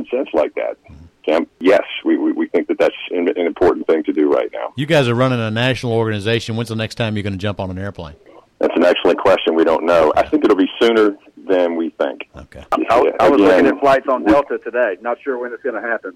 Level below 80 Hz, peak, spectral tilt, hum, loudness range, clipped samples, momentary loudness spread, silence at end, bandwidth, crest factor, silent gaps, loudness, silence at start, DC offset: -48 dBFS; -4 dBFS; -6.5 dB/octave; none; 4 LU; under 0.1%; 10 LU; 0.05 s; 13 kHz; 12 dB; none; -16 LUFS; 0 s; under 0.1%